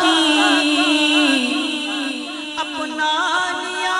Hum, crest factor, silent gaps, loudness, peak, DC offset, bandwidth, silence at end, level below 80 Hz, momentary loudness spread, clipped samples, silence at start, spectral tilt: none; 16 dB; none; -17 LUFS; -4 dBFS; under 0.1%; 12 kHz; 0 s; -62 dBFS; 11 LU; under 0.1%; 0 s; -0.5 dB/octave